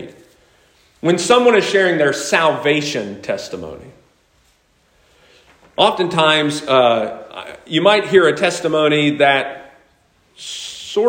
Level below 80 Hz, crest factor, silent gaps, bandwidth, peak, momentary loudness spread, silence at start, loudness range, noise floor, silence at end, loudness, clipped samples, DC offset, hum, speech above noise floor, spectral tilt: -60 dBFS; 18 dB; none; 16.5 kHz; 0 dBFS; 17 LU; 0 s; 8 LU; -58 dBFS; 0 s; -15 LUFS; under 0.1%; under 0.1%; none; 42 dB; -4 dB/octave